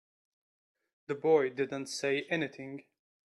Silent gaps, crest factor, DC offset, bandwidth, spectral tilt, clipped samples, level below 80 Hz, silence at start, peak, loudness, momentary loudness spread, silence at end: none; 20 dB; under 0.1%; 12.5 kHz; -4.5 dB/octave; under 0.1%; -82 dBFS; 1.1 s; -14 dBFS; -32 LUFS; 17 LU; 0.45 s